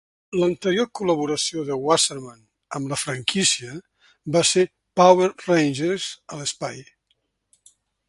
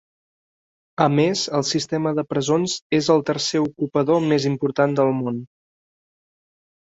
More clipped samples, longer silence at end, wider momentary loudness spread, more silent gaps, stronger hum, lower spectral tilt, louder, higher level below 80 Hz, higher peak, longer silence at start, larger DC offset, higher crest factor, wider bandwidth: neither; second, 1.25 s vs 1.4 s; first, 15 LU vs 5 LU; second, none vs 2.82-2.90 s; neither; second, -3.5 dB/octave vs -5 dB/octave; about the same, -21 LUFS vs -21 LUFS; about the same, -62 dBFS vs -62 dBFS; about the same, -2 dBFS vs -2 dBFS; second, 0.3 s vs 1 s; neither; about the same, 22 dB vs 20 dB; first, 11.5 kHz vs 8 kHz